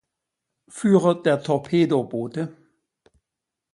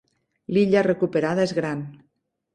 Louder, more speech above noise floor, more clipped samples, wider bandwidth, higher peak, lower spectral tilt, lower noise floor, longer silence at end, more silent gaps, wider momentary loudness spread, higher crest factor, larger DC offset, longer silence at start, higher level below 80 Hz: about the same, -22 LUFS vs -22 LUFS; first, 64 dB vs 50 dB; neither; first, 11.5 kHz vs 9.8 kHz; about the same, -4 dBFS vs -6 dBFS; about the same, -7 dB/octave vs -7 dB/octave; first, -85 dBFS vs -72 dBFS; first, 1.2 s vs 0.6 s; neither; about the same, 13 LU vs 15 LU; about the same, 20 dB vs 18 dB; neither; first, 0.75 s vs 0.5 s; about the same, -66 dBFS vs -62 dBFS